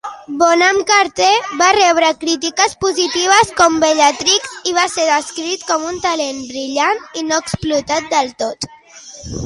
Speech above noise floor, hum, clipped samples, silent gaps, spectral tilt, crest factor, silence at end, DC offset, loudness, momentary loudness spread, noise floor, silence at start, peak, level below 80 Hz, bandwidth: 23 dB; none; under 0.1%; none; -2 dB/octave; 16 dB; 0 s; under 0.1%; -14 LUFS; 11 LU; -38 dBFS; 0.05 s; 0 dBFS; -46 dBFS; 11.5 kHz